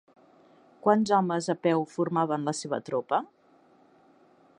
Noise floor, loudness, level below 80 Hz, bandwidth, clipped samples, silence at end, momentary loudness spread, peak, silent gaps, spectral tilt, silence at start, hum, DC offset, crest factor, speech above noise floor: -60 dBFS; -27 LUFS; -76 dBFS; 10.5 kHz; under 0.1%; 1.35 s; 7 LU; -8 dBFS; none; -6 dB/octave; 0.85 s; none; under 0.1%; 22 dB; 34 dB